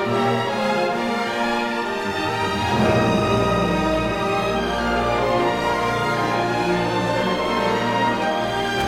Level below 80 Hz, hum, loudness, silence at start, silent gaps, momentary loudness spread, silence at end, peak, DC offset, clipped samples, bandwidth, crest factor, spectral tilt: -40 dBFS; none; -21 LUFS; 0 s; none; 4 LU; 0 s; -8 dBFS; under 0.1%; under 0.1%; 16.5 kHz; 14 dB; -5.5 dB/octave